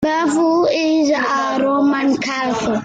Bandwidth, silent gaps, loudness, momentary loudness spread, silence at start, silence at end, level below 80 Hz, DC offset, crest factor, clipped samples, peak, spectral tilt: 9.2 kHz; none; -16 LUFS; 4 LU; 0 s; 0 s; -52 dBFS; under 0.1%; 10 dB; under 0.1%; -6 dBFS; -4.5 dB/octave